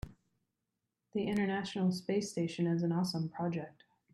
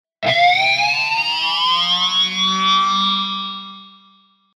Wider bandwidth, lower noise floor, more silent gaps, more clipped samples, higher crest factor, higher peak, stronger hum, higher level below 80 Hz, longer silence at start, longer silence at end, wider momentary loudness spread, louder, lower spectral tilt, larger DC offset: second, 12.5 kHz vs 15 kHz; first, -87 dBFS vs -54 dBFS; neither; neither; about the same, 14 dB vs 16 dB; second, -22 dBFS vs -2 dBFS; neither; first, -62 dBFS vs -72 dBFS; second, 0.05 s vs 0.2 s; second, 0.45 s vs 0.7 s; about the same, 9 LU vs 10 LU; second, -35 LUFS vs -15 LUFS; first, -6.5 dB/octave vs -2 dB/octave; neither